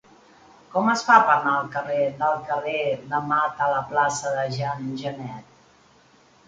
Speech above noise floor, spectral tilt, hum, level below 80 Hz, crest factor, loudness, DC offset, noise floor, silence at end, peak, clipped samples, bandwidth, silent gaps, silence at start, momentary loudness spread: 33 dB; -4.5 dB/octave; none; -64 dBFS; 22 dB; -23 LUFS; under 0.1%; -56 dBFS; 1.05 s; -2 dBFS; under 0.1%; 9.4 kHz; none; 0.7 s; 14 LU